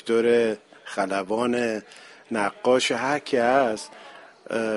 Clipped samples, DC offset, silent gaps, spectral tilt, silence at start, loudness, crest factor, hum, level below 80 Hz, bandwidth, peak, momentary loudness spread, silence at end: under 0.1%; under 0.1%; none; -4 dB/octave; 0.05 s; -24 LUFS; 16 dB; none; -68 dBFS; 11.5 kHz; -8 dBFS; 13 LU; 0 s